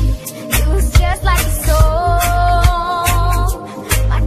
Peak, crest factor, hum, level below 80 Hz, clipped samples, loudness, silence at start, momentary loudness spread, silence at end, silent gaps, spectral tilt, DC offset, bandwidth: 0 dBFS; 12 dB; none; -16 dBFS; under 0.1%; -15 LUFS; 0 s; 6 LU; 0 s; none; -4.5 dB/octave; under 0.1%; 14.5 kHz